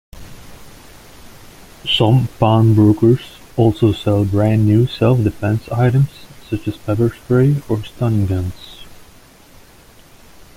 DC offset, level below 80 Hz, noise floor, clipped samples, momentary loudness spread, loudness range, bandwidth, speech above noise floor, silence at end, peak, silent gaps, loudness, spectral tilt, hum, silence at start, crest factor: under 0.1%; -42 dBFS; -44 dBFS; under 0.1%; 12 LU; 6 LU; 15.5 kHz; 30 dB; 1.65 s; -2 dBFS; none; -16 LUFS; -8 dB/octave; none; 0.15 s; 16 dB